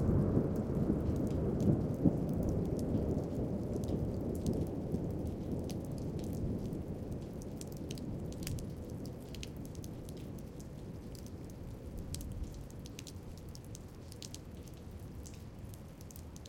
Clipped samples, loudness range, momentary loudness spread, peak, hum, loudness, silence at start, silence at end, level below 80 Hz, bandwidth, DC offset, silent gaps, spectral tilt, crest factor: under 0.1%; 13 LU; 16 LU; -14 dBFS; none; -39 LUFS; 0 s; 0 s; -48 dBFS; 17 kHz; under 0.1%; none; -7.5 dB/octave; 24 dB